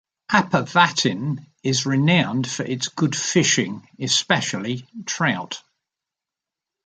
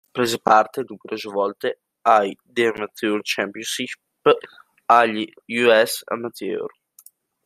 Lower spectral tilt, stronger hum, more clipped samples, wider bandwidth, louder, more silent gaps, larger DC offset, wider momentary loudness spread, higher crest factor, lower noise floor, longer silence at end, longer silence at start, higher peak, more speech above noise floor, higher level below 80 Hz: about the same, -3.5 dB/octave vs -3.5 dB/octave; neither; neither; second, 9.6 kHz vs 15.5 kHz; about the same, -21 LUFS vs -21 LUFS; neither; neither; about the same, 12 LU vs 13 LU; about the same, 22 dB vs 20 dB; first, -87 dBFS vs -52 dBFS; first, 1.25 s vs 0.75 s; first, 0.3 s vs 0.15 s; about the same, 0 dBFS vs -2 dBFS; first, 66 dB vs 32 dB; first, -62 dBFS vs -68 dBFS